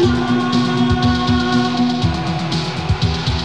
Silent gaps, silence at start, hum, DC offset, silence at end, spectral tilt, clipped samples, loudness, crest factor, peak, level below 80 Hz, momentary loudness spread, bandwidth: none; 0 s; none; 0.9%; 0 s; -6 dB/octave; under 0.1%; -17 LUFS; 12 dB; -4 dBFS; -30 dBFS; 5 LU; 9.6 kHz